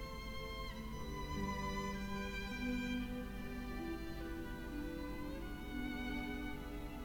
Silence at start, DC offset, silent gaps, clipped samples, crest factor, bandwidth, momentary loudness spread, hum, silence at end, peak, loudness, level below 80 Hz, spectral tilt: 0 s; under 0.1%; none; under 0.1%; 14 dB; over 20 kHz; 6 LU; none; 0 s; -28 dBFS; -44 LUFS; -48 dBFS; -5.5 dB/octave